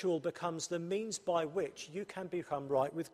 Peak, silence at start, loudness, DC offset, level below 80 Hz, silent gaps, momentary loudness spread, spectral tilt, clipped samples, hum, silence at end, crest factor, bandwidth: -20 dBFS; 0 s; -37 LUFS; under 0.1%; -76 dBFS; none; 7 LU; -4.5 dB/octave; under 0.1%; none; 0.05 s; 16 dB; 14.5 kHz